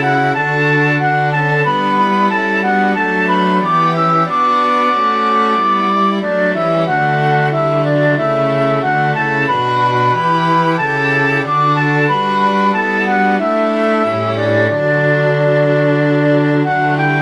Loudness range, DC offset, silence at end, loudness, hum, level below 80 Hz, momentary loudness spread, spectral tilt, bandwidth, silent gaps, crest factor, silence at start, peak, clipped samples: 1 LU; under 0.1%; 0 s; -13 LUFS; none; -58 dBFS; 2 LU; -7 dB/octave; 10.5 kHz; none; 12 dB; 0 s; -2 dBFS; under 0.1%